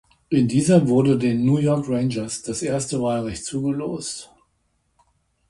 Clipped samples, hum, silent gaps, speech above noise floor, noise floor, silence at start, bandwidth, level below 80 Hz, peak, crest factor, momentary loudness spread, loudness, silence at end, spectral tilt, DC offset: under 0.1%; none; none; 48 dB; -68 dBFS; 0.3 s; 11.5 kHz; -52 dBFS; -4 dBFS; 18 dB; 11 LU; -21 LUFS; 1.25 s; -6.5 dB/octave; under 0.1%